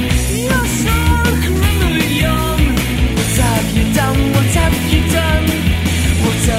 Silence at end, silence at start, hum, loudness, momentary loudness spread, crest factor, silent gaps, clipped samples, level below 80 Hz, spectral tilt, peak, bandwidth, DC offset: 0 s; 0 s; none; -14 LUFS; 2 LU; 14 dB; none; under 0.1%; -20 dBFS; -5 dB/octave; 0 dBFS; 16.5 kHz; under 0.1%